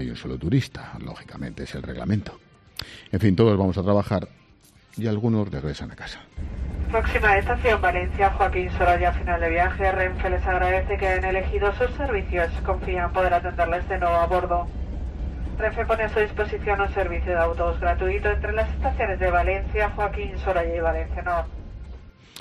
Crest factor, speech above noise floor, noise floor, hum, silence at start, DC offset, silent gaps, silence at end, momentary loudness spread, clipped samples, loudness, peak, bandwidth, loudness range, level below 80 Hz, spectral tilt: 18 dB; 31 dB; -54 dBFS; none; 0 s; under 0.1%; none; 0 s; 15 LU; under 0.1%; -24 LUFS; -6 dBFS; 12.5 kHz; 4 LU; -30 dBFS; -7.5 dB/octave